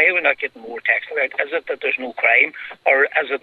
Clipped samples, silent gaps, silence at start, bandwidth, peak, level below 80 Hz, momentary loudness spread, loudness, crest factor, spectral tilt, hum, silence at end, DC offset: under 0.1%; none; 0 s; 4.8 kHz; -2 dBFS; -72 dBFS; 9 LU; -18 LUFS; 18 dB; -4 dB/octave; none; 0.05 s; under 0.1%